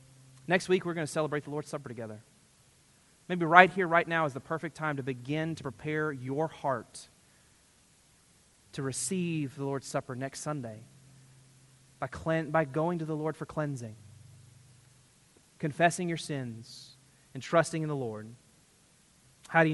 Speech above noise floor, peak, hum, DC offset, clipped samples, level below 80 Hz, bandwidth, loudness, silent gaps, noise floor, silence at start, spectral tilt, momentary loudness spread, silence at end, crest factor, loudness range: 33 dB; -2 dBFS; none; under 0.1%; under 0.1%; -68 dBFS; 11.5 kHz; -31 LUFS; none; -64 dBFS; 0.5 s; -5 dB/octave; 18 LU; 0 s; 30 dB; 10 LU